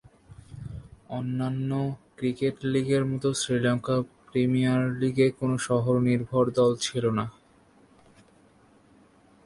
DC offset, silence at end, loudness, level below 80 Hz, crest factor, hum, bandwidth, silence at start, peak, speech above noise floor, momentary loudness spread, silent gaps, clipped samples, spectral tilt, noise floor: under 0.1%; 2.15 s; -26 LUFS; -58 dBFS; 18 dB; none; 11.5 kHz; 0.3 s; -10 dBFS; 33 dB; 14 LU; none; under 0.1%; -6 dB/octave; -59 dBFS